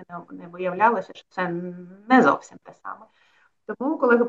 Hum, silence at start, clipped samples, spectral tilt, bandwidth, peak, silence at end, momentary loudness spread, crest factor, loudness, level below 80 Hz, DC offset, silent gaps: none; 0 s; under 0.1%; -6.5 dB/octave; 7.6 kHz; -4 dBFS; 0 s; 22 LU; 20 dB; -22 LUFS; -76 dBFS; under 0.1%; none